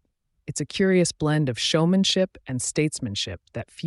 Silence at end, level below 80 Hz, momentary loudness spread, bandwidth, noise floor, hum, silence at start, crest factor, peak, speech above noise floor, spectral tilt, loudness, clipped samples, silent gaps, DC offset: 0 s; -54 dBFS; 13 LU; 11.5 kHz; -42 dBFS; none; 0.45 s; 16 dB; -8 dBFS; 19 dB; -4.5 dB/octave; -23 LUFS; under 0.1%; none; under 0.1%